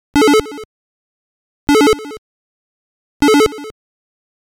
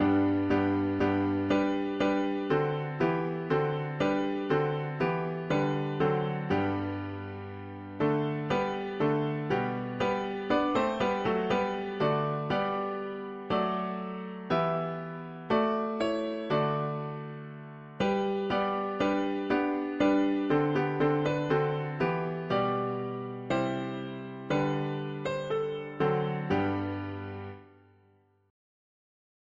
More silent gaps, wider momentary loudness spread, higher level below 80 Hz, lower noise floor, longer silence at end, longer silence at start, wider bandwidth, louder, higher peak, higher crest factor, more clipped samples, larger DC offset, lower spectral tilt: first, 0.65-1.67 s, 2.18-3.20 s vs none; first, 21 LU vs 10 LU; first, -42 dBFS vs -60 dBFS; first, under -90 dBFS vs -65 dBFS; second, 0.9 s vs 1.85 s; first, 0.15 s vs 0 s; first, 19 kHz vs 7.8 kHz; first, -13 LUFS vs -30 LUFS; first, -2 dBFS vs -14 dBFS; about the same, 14 dB vs 16 dB; neither; neither; second, -3.5 dB/octave vs -7.5 dB/octave